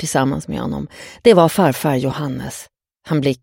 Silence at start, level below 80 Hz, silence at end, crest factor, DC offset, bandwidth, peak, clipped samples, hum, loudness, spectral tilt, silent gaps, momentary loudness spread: 0 s; -46 dBFS; 0.05 s; 18 dB; under 0.1%; 17 kHz; 0 dBFS; under 0.1%; none; -17 LUFS; -5.5 dB/octave; none; 16 LU